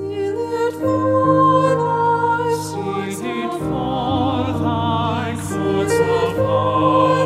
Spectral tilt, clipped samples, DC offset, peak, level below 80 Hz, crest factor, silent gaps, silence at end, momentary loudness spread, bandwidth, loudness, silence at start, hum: -6.5 dB/octave; under 0.1%; under 0.1%; -2 dBFS; -46 dBFS; 16 dB; none; 0 s; 9 LU; 15 kHz; -18 LUFS; 0 s; none